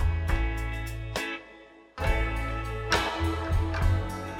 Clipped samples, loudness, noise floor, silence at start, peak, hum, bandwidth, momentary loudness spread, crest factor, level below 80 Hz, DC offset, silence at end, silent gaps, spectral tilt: under 0.1%; -30 LUFS; -51 dBFS; 0 s; -10 dBFS; none; 16 kHz; 8 LU; 18 dB; -32 dBFS; under 0.1%; 0 s; none; -5.5 dB/octave